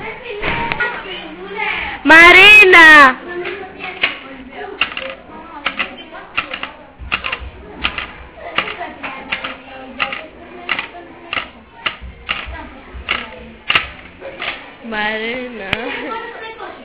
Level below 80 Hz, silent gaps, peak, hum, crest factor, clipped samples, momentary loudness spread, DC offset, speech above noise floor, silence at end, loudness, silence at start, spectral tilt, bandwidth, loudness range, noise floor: -40 dBFS; none; 0 dBFS; none; 16 dB; 0.6%; 27 LU; under 0.1%; 30 dB; 0 s; -11 LUFS; 0 s; -6 dB/octave; 4 kHz; 17 LU; -34 dBFS